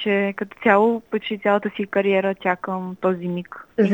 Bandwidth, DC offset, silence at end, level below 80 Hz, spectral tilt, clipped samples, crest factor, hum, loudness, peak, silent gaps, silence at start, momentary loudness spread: 18 kHz; under 0.1%; 0 s; -66 dBFS; -8 dB/octave; under 0.1%; 18 dB; none; -22 LUFS; -2 dBFS; none; 0 s; 10 LU